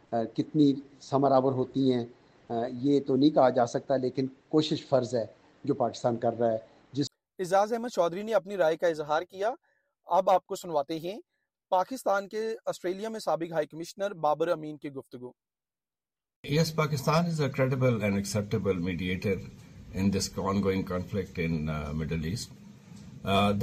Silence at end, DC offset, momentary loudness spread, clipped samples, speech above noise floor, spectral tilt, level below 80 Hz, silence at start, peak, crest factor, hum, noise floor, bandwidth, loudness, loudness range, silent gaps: 0 s; under 0.1%; 13 LU; under 0.1%; over 62 dB; -6 dB/octave; -56 dBFS; 0.1 s; -10 dBFS; 18 dB; none; under -90 dBFS; 15.5 kHz; -29 LUFS; 5 LU; 16.36-16.44 s